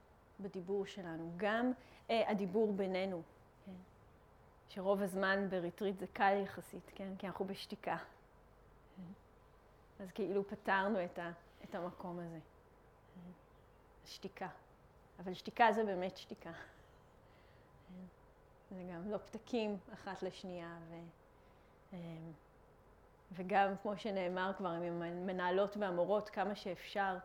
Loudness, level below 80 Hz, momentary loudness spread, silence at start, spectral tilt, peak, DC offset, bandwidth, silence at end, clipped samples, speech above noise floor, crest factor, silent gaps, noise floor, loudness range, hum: -40 LUFS; -70 dBFS; 21 LU; 0.4 s; -6 dB/octave; -16 dBFS; under 0.1%; 17.5 kHz; 0 s; under 0.1%; 25 dB; 24 dB; none; -65 dBFS; 12 LU; none